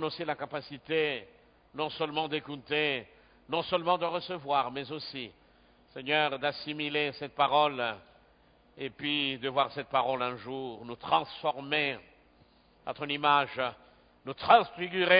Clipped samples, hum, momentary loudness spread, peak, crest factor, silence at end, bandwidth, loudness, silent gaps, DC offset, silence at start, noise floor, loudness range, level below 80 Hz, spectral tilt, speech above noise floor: under 0.1%; none; 16 LU; -8 dBFS; 24 dB; 0 s; 5.2 kHz; -30 LUFS; none; under 0.1%; 0 s; -63 dBFS; 3 LU; -68 dBFS; -8 dB/octave; 33 dB